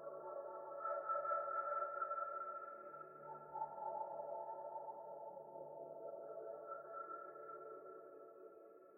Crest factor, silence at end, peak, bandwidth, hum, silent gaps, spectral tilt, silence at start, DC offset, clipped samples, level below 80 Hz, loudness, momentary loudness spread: 18 dB; 0 s; -30 dBFS; 2.7 kHz; none; none; 1 dB/octave; 0 s; under 0.1%; under 0.1%; under -90 dBFS; -47 LUFS; 13 LU